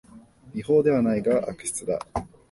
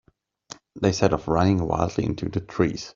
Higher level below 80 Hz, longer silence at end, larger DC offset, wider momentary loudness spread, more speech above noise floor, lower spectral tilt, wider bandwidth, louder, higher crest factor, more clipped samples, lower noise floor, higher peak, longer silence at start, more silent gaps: about the same, -50 dBFS vs -46 dBFS; first, 0.25 s vs 0.05 s; neither; second, 14 LU vs 17 LU; about the same, 26 dB vs 24 dB; about the same, -6 dB/octave vs -6.5 dB/octave; first, 11.5 kHz vs 7.6 kHz; about the same, -24 LUFS vs -24 LUFS; second, 16 dB vs 22 dB; neither; about the same, -49 dBFS vs -47 dBFS; second, -8 dBFS vs -2 dBFS; second, 0.15 s vs 0.5 s; neither